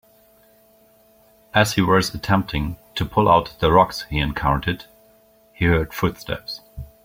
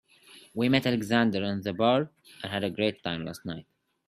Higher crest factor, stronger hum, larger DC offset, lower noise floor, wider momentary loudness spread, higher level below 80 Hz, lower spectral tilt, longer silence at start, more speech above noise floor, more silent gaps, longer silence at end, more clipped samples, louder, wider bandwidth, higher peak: about the same, 20 dB vs 22 dB; neither; neither; about the same, -55 dBFS vs -55 dBFS; about the same, 13 LU vs 14 LU; first, -38 dBFS vs -66 dBFS; about the same, -5.5 dB/octave vs -6 dB/octave; first, 1.55 s vs 0.3 s; first, 35 dB vs 27 dB; neither; second, 0.2 s vs 0.45 s; neither; first, -20 LUFS vs -28 LUFS; first, 16.5 kHz vs 14 kHz; first, -2 dBFS vs -6 dBFS